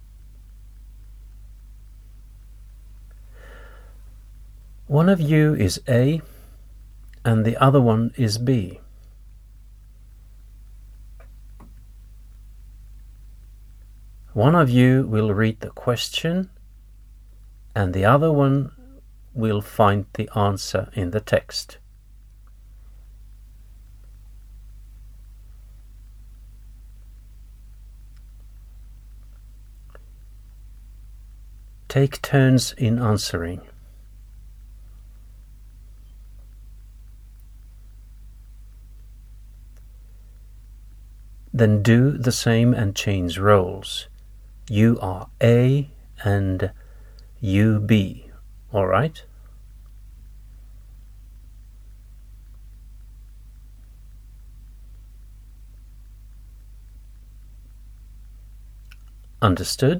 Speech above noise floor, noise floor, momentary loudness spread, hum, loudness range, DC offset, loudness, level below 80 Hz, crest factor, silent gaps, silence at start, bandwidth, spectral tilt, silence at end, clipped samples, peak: 28 dB; -47 dBFS; 14 LU; none; 9 LU; under 0.1%; -20 LUFS; -44 dBFS; 22 dB; none; 0.55 s; 16 kHz; -6.5 dB/octave; 0 s; under 0.1%; -2 dBFS